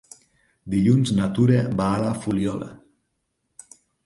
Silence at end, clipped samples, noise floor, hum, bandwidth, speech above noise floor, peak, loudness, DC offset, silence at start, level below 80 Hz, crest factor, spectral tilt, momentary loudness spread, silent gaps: 1.3 s; under 0.1%; -75 dBFS; none; 11.5 kHz; 54 dB; -6 dBFS; -22 LUFS; under 0.1%; 0.65 s; -50 dBFS; 18 dB; -7.5 dB/octave; 9 LU; none